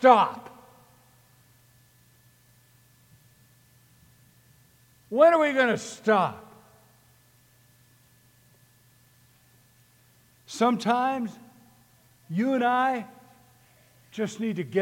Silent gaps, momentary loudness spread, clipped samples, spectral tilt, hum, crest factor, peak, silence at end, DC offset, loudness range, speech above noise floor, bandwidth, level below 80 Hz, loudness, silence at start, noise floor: none; 22 LU; under 0.1%; -5 dB/octave; none; 24 dB; -4 dBFS; 0 s; under 0.1%; 7 LU; 37 dB; 17 kHz; -74 dBFS; -24 LUFS; 0 s; -60 dBFS